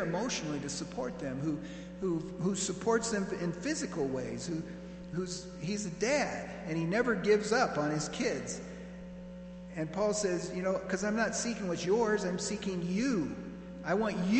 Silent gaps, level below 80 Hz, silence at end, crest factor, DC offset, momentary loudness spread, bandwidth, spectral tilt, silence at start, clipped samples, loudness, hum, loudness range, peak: none; -58 dBFS; 0 s; 18 dB; under 0.1%; 12 LU; 9.2 kHz; -4.5 dB/octave; 0 s; under 0.1%; -33 LUFS; none; 4 LU; -14 dBFS